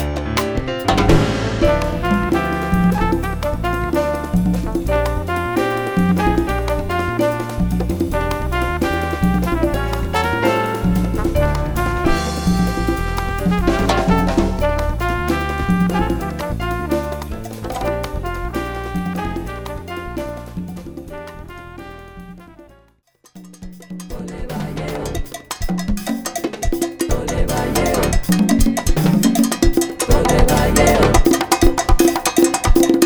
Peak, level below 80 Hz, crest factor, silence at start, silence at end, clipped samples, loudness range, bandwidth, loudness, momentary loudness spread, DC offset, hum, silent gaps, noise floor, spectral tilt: 0 dBFS; -24 dBFS; 18 dB; 0 s; 0 s; under 0.1%; 15 LU; over 20 kHz; -18 LUFS; 14 LU; under 0.1%; none; none; -54 dBFS; -5.5 dB/octave